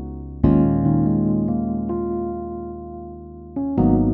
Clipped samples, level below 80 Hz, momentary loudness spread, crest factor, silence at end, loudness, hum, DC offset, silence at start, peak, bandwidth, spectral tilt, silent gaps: under 0.1%; -34 dBFS; 17 LU; 18 dB; 0 s; -21 LUFS; none; under 0.1%; 0 s; -2 dBFS; 3.1 kHz; -14 dB/octave; none